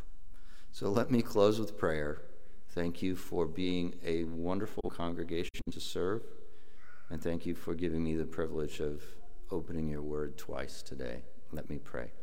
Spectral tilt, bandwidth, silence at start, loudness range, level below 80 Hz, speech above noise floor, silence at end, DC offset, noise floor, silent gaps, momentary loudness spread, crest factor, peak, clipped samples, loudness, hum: -6 dB/octave; 16.5 kHz; 0 s; 6 LU; -54 dBFS; 23 dB; 0 s; 2%; -59 dBFS; none; 13 LU; 22 dB; -16 dBFS; under 0.1%; -36 LUFS; none